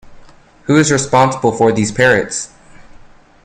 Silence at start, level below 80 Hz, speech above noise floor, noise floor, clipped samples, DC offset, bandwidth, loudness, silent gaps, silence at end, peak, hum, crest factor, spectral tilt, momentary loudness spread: 0.05 s; -46 dBFS; 28 dB; -41 dBFS; under 0.1%; under 0.1%; 12 kHz; -13 LUFS; none; 0.45 s; 0 dBFS; none; 16 dB; -4.5 dB/octave; 11 LU